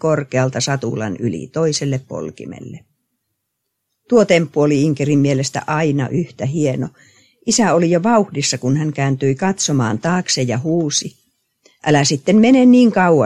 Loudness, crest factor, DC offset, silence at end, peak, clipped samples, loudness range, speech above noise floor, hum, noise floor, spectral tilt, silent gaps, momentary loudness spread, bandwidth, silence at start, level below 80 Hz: -16 LUFS; 16 dB; under 0.1%; 0 s; 0 dBFS; under 0.1%; 6 LU; 59 dB; none; -74 dBFS; -5 dB/octave; none; 12 LU; 11.5 kHz; 0.05 s; -56 dBFS